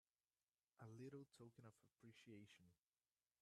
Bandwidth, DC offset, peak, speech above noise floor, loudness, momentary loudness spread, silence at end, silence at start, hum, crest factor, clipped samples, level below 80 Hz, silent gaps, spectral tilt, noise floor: 12.5 kHz; under 0.1%; -48 dBFS; over 22 dB; -64 LUFS; 8 LU; 0.65 s; 0.75 s; none; 18 dB; under 0.1%; under -90 dBFS; none; -6 dB/octave; under -90 dBFS